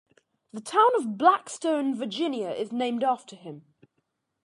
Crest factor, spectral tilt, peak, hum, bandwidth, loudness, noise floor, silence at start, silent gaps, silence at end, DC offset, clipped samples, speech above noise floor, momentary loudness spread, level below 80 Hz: 22 dB; -4 dB/octave; -6 dBFS; none; 11.5 kHz; -25 LUFS; -77 dBFS; 0.55 s; none; 0.85 s; under 0.1%; under 0.1%; 52 dB; 20 LU; -82 dBFS